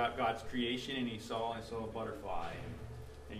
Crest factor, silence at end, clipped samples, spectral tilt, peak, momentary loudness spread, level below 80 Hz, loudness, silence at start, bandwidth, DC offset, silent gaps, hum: 18 dB; 0 s; under 0.1%; -5 dB/octave; -20 dBFS; 11 LU; -56 dBFS; -40 LUFS; 0 s; 15 kHz; under 0.1%; none; none